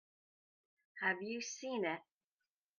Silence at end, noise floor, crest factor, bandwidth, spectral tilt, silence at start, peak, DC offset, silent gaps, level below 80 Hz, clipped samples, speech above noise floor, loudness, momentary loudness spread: 0.75 s; under -90 dBFS; 22 dB; 10 kHz; -3 dB/octave; 0.95 s; -22 dBFS; under 0.1%; none; -90 dBFS; under 0.1%; over 50 dB; -40 LUFS; 8 LU